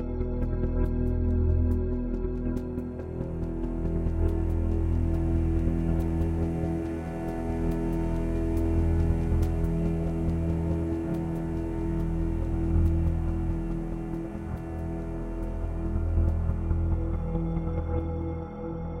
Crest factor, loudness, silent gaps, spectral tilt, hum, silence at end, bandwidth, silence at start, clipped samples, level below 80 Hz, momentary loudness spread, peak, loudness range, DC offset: 14 dB; -30 LUFS; none; -10 dB/octave; none; 0 s; 3.7 kHz; 0 s; under 0.1%; -30 dBFS; 8 LU; -12 dBFS; 3 LU; under 0.1%